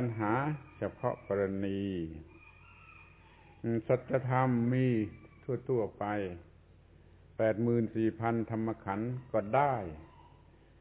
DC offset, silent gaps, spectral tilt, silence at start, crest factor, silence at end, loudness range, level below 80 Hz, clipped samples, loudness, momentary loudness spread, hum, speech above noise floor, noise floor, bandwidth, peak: under 0.1%; none; -8 dB/octave; 0 s; 20 dB; 0.6 s; 4 LU; -60 dBFS; under 0.1%; -33 LUFS; 14 LU; none; 27 dB; -59 dBFS; 4 kHz; -14 dBFS